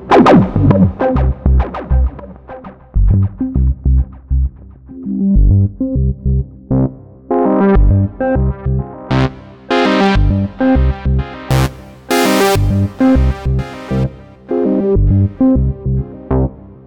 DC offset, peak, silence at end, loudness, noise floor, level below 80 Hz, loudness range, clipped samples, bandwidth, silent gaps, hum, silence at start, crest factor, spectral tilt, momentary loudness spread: under 0.1%; 0 dBFS; 0.15 s; -14 LUFS; -34 dBFS; -18 dBFS; 3 LU; under 0.1%; 18 kHz; none; none; 0 s; 12 dB; -7.5 dB/octave; 9 LU